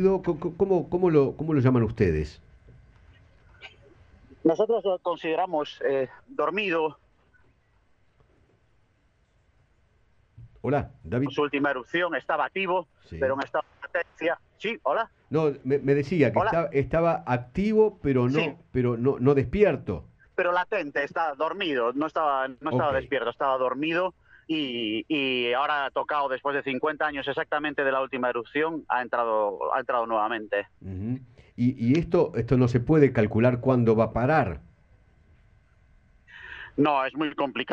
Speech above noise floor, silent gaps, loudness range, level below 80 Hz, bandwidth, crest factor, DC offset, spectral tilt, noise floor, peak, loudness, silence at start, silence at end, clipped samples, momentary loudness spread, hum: 41 dB; none; 6 LU; -50 dBFS; 7.6 kHz; 20 dB; under 0.1%; -8 dB/octave; -66 dBFS; -6 dBFS; -26 LUFS; 0 s; 0 s; under 0.1%; 9 LU; none